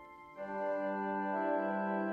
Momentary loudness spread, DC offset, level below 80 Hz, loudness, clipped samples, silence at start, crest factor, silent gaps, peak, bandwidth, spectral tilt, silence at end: 10 LU; under 0.1%; -78 dBFS; -36 LUFS; under 0.1%; 0 s; 14 dB; none; -24 dBFS; 6.2 kHz; -9 dB/octave; 0 s